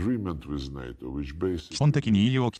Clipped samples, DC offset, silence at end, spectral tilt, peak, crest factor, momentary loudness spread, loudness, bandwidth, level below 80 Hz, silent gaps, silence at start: under 0.1%; under 0.1%; 0 s; -7 dB/octave; -12 dBFS; 14 dB; 14 LU; -27 LUFS; 9.6 kHz; -44 dBFS; none; 0 s